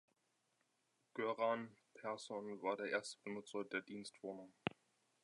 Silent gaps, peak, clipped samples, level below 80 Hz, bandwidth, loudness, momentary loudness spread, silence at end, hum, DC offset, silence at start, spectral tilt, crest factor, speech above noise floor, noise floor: none; -20 dBFS; under 0.1%; -84 dBFS; 11 kHz; -45 LUFS; 12 LU; 0.55 s; none; under 0.1%; 1.15 s; -4.5 dB/octave; 28 dB; 39 dB; -84 dBFS